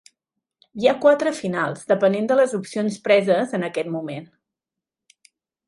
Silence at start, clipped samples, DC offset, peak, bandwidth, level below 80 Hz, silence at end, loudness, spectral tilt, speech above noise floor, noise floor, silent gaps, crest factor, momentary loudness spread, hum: 0.75 s; under 0.1%; under 0.1%; -4 dBFS; 11.5 kHz; -70 dBFS; 1.4 s; -21 LUFS; -5.5 dB/octave; 67 dB; -87 dBFS; none; 18 dB; 11 LU; none